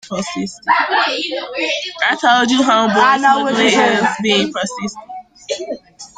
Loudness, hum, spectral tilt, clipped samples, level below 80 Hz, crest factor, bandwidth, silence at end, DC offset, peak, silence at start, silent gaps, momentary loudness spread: -15 LUFS; none; -3 dB/octave; under 0.1%; -58 dBFS; 14 dB; 9.4 kHz; 0.1 s; under 0.1%; -2 dBFS; 0.05 s; none; 14 LU